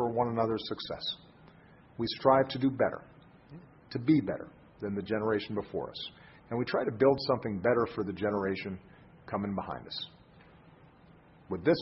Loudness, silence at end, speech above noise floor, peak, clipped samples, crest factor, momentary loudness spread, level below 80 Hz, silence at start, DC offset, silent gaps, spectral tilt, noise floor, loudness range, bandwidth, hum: -32 LUFS; 0 s; 27 dB; -10 dBFS; under 0.1%; 22 dB; 16 LU; -60 dBFS; 0 s; under 0.1%; none; -9.5 dB/octave; -58 dBFS; 6 LU; 5.8 kHz; none